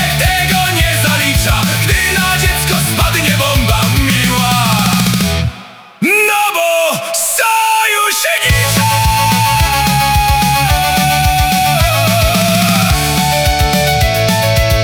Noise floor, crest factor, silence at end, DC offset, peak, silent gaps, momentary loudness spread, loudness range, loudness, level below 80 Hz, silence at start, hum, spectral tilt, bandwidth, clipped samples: -33 dBFS; 10 dB; 0 s; under 0.1%; 0 dBFS; none; 2 LU; 1 LU; -11 LUFS; -22 dBFS; 0 s; none; -3.5 dB/octave; over 20 kHz; under 0.1%